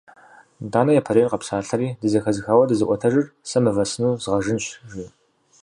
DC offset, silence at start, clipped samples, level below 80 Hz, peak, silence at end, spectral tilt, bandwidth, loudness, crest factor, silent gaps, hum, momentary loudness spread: under 0.1%; 0.6 s; under 0.1%; -54 dBFS; -4 dBFS; 0.55 s; -6 dB/octave; 11 kHz; -21 LUFS; 18 dB; none; none; 15 LU